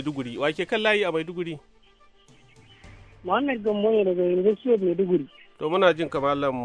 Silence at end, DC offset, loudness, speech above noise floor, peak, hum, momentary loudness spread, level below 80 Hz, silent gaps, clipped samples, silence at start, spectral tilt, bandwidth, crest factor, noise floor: 0 s; under 0.1%; -24 LUFS; 32 dB; -6 dBFS; none; 12 LU; -60 dBFS; none; under 0.1%; 0 s; -6.5 dB/octave; 10 kHz; 18 dB; -56 dBFS